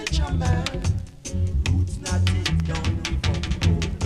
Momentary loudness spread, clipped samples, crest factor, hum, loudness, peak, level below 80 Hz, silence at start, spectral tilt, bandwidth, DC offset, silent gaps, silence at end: 5 LU; under 0.1%; 16 dB; none; -24 LUFS; -6 dBFS; -28 dBFS; 0 s; -5 dB/octave; 11.5 kHz; under 0.1%; none; 0 s